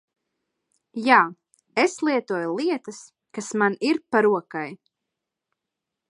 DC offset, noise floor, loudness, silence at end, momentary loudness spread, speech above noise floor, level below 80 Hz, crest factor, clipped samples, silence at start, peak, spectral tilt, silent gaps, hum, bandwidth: under 0.1%; -85 dBFS; -23 LUFS; 1.35 s; 18 LU; 62 dB; -78 dBFS; 24 dB; under 0.1%; 0.95 s; -2 dBFS; -4.5 dB/octave; none; none; 11.5 kHz